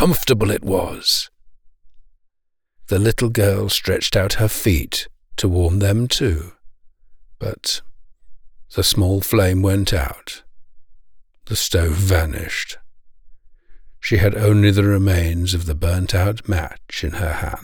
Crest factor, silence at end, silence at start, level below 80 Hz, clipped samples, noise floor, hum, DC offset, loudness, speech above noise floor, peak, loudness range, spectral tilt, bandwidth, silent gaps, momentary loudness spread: 16 dB; 0 s; 0 s; -32 dBFS; under 0.1%; -69 dBFS; none; under 0.1%; -19 LUFS; 51 dB; -4 dBFS; 5 LU; -5 dB/octave; over 20 kHz; none; 12 LU